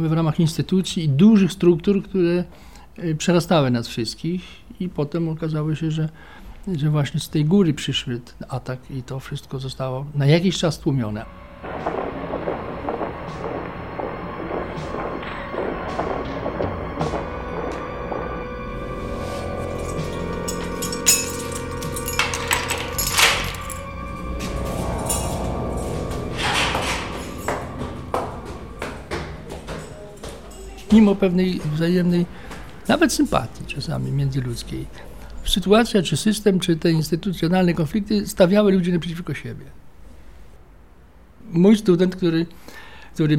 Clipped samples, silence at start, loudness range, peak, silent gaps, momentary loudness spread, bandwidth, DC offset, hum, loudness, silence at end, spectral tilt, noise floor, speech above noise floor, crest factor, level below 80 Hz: under 0.1%; 0 s; 9 LU; -2 dBFS; none; 16 LU; 16.5 kHz; 0.4%; none; -22 LUFS; 0 s; -5 dB/octave; -48 dBFS; 28 dB; 20 dB; -38 dBFS